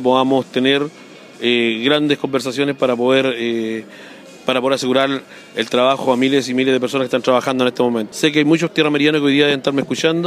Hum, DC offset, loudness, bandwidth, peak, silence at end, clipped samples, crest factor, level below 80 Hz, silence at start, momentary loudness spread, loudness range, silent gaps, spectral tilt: none; under 0.1%; -16 LUFS; 15 kHz; -2 dBFS; 0 s; under 0.1%; 14 dB; -64 dBFS; 0 s; 8 LU; 3 LU; none; -4.5 dB/octave